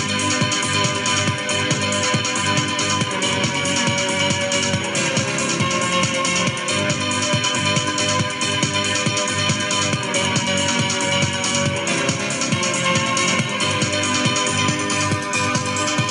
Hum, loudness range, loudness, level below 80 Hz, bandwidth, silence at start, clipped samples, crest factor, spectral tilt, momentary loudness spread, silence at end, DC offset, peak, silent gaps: none; 0 LU; -18 LUFS; -56 dBFS; 12 kHz; 0 s; under 0.1%; 16 dB; -3 dB/octave; 2 LU; 0 s; under 0.1%; -4 dBFS; none